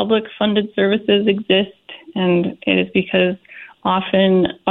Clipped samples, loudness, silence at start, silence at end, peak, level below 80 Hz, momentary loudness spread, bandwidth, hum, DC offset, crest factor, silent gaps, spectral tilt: under 0.1%; -17 LUFS; 0 s; 0 s; 0 dBFS; -54 dBFS; 9 LU; 4.1 kHz; none; under 0.1%; 18 dB; none; -9.5 dB/octave